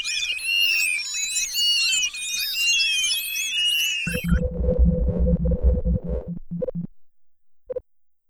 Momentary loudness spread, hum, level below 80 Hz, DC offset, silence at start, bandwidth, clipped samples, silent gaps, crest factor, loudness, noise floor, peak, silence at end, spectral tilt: 13 LU; none; -28 dBFS; under 0.1%; 0 s; over 20 kHz; under 0.1%; none; 16 dB; -21 LUFS; -57 dBFS; -8 dBFS; 0.5 s; -2.5 dB/octave